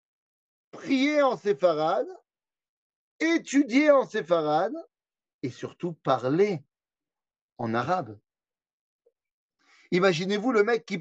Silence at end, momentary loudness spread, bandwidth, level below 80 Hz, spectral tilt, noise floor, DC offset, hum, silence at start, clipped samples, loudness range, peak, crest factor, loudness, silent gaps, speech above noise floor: 0 s; 14 LU; 8.4 kHz; -80 dBFS; -5.5 dB/octave; under -90 dBFS; under 0.1%; none; 0.75 s; under 0.1%; 6 LU; -8 dBFS; 20 dB; -25 LUFS; 2.69-3.19 s, 5.34-5.39 s, 7.41-7.56 s, 8.73-8.99 s, 9.32-9.49 s; over 65 dB